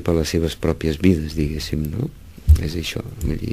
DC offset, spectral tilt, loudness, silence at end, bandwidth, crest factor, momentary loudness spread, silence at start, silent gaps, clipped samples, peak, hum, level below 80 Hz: 0.4%; -6.5 dB/octave; -22 LUFS; 0 s; 15.5 kHz; 18 dB; 9 LU; 0 s; none; under 0.1%; -2 dBFS; none; -26 dBFS